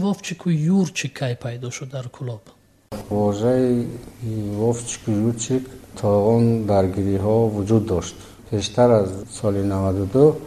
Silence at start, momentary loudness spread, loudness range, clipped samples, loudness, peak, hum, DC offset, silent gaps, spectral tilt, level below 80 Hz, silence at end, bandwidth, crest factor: 0 s; 15 LU; 5 LU; under 0.1%; -21 LUFS; -2 dBFS; none; under 0.1%; none; -6.5 dB/octave; -48 dBFS; 0 s; 13.5 kHz; 18 dB